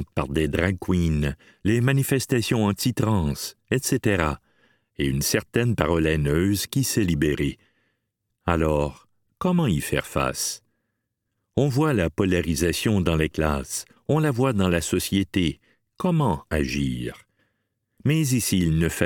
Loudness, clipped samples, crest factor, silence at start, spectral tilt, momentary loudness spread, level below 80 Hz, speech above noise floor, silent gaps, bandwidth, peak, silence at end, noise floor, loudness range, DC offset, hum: -24 LUFS; under 0.1%; 20 dB; 0 s; -5.5 dB/octave; 7 LU; -40 dBFS; 56 dB; none; 19 kHz; -4 dBFS; 0 s; -78 dBFS; 3 LU; under 0.1%; none